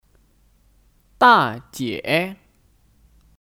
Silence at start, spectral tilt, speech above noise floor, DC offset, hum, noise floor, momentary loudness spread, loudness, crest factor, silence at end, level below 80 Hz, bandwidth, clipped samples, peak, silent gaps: 1.2 s; -4.5 dB/octave; 39 dB; under 0.1%; none; -58 dBFS; 15 LU; -18 LUFS; 22 dB; 1.1 s; -58 dBFS; 17 kHz; under 0.1%; -2 dBFS; none